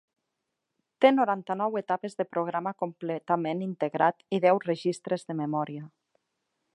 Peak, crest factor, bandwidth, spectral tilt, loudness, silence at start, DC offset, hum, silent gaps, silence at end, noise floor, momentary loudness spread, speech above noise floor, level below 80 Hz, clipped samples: -6 dBFS; 22 dB; 10.5 kHz; -6.5 dB/octave; -28 LUFS; 1 s; under 0.1%; none; none; 0.85 s; -83 dBFS; 9 LU; 56 dB; -84 dBFS; under 0.1%